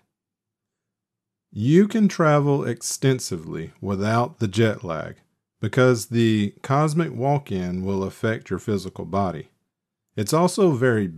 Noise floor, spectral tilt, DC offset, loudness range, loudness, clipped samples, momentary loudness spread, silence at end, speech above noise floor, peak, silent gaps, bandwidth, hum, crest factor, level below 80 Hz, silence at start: -86 dBFS; -6 dB/octave; under 0.1%; 4 LU; -22 LUFS; under 0.1%; 12 LU; 0 s; 64 dB; -6 dBFS; none; 14.5 kHz; none; 18 dB; -60 dBFS; 1.55 s